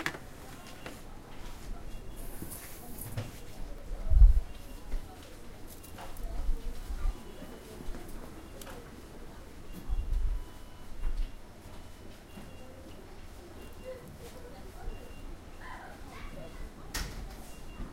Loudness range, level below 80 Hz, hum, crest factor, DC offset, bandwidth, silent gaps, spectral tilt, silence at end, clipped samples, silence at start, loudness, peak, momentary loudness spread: 14 LU; -34 dBFS; none; 26 dB; under 0.1%; 16 kHz; none; -5 dB/octave; 0 s; under 0.1%; 0 s; -40 LUFS; -8 dBFS; 12 LU